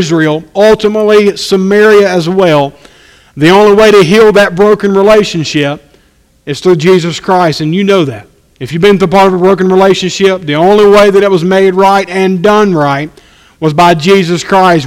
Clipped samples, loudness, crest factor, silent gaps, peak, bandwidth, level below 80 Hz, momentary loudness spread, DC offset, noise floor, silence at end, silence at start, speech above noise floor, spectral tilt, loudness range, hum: 3%; -7 LUFS; 6 dB; none; 0 dBFS; 15.5 kHz; -40 dBFS; 9 LU; under 0.1%; -47 dBFS; 0 s; 0 s; 41 dB; -5.5 dB/octave; 3 LU; none